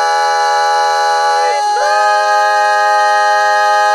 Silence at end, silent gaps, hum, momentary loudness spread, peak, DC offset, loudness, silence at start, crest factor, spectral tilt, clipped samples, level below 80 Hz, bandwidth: 0 s; none; none; 2 LU; 0 dBFS; under 0.1%; -11 LUFS; 0 s; 10 dB; 3.5 dB/octave; under 0.1%; -72 dBFS; 13 kHz